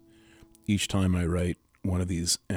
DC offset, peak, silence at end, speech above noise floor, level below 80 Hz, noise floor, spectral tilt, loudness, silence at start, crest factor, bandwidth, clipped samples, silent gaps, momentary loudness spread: under 0.1%; -14 dBFS; 0 s; 29 dB; -46 dBFS; -56 dBFS; -4.5 dB/octave; -28 LUFS; 0.7 s; 16 dB; 16.5 kHz; under 0.1%; none; 7 LU